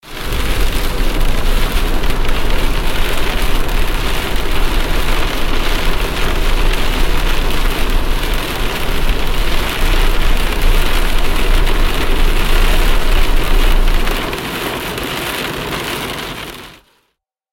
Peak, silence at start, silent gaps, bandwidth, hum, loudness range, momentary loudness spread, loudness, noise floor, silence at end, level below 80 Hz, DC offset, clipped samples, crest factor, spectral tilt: -2 dBFS; 0.05 s; none; 17 kHz; none; 2 LU; 3 LU; -18 LUFS; -68 dBFS; 0.8 s; -14 dBFS; under 0.1%; under 0.1%; 10 dB; -4 dB/octave